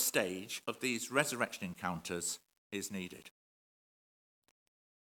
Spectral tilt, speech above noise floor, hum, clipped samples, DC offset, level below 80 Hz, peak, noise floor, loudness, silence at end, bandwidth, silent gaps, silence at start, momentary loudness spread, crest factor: -2.5 dB/octave; over 52 dB; none; under 0.1%; under 0.1%; -80 dBFS; -12 dBFS; under -90 dBFS; -38 LUFS; 1.85 s; 18 kHz; 2.58-2.70 s; 0 s; 12 LU; 28 dB